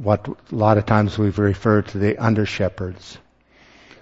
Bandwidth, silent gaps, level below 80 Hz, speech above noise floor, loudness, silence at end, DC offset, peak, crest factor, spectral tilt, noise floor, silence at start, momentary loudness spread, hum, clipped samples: 7.8 kHz; none; -46 dBFS; 34 dB; -20 LUFS; 0.85 s; under 0.1%; 0 dBFS; 20 dB; -8 dB/octave; -53 dBFS; 0 s; 12 LU; none; under 0.1%